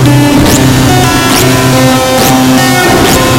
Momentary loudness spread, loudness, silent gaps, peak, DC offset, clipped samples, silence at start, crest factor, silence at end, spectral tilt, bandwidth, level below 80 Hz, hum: 1 LU; -5 LUFS; none; 0 dBFS; under 0.1%; 5%; 0 s; 6 dB; 0 s; -4.5 dB/octave; 18 kHz; -24 dBFS; none